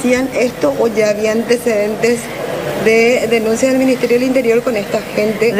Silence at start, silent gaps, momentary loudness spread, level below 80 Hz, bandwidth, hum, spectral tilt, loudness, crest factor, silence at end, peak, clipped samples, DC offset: 0 s; none; 6 LU; -46 dBFS; 16 kHz; none; -4.5 dB/octave; -14 LUFS; 14 dB; 0 s; 0 dBFS; under 0.1%; under 0.1%